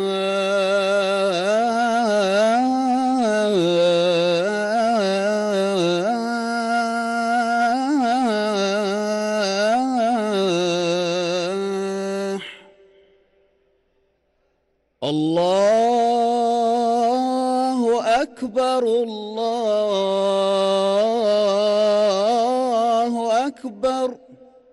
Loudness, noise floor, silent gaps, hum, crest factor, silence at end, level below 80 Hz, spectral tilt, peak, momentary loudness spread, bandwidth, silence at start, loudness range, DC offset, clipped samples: -20 LUFS; -68 dBFS; none; none; 10 dB; 0.4 s; -64 dBFS; -4.5 dB/octave; -10 dBFS; 6 LU; 12 kHz; 0 s; 6 LU; under 0.1%; under 0.1%